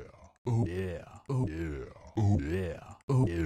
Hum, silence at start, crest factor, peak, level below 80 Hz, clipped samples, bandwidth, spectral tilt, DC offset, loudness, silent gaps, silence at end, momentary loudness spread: none; 0 s; 14 dB; -16 dBFS; -50 dBFS; under 0.1%; 10 kHz; -8.5 dB/octave; under 0.1%; -33 LUFS; 0.38-0.45 s, 3.03-3.08 s; 0 s; 14 LU